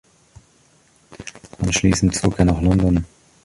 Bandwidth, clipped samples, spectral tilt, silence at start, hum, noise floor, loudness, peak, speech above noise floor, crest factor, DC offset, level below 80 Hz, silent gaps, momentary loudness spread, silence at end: 11.5 kHz; under 0.1%; -5.5 dB/octave; 1.1 s; none; -56 dBFS; -18 LUFS; -2 dBFS; 39 dB; 18 dB; under 0.1%; -32 dBFS; none; 20 LU; 0.4 s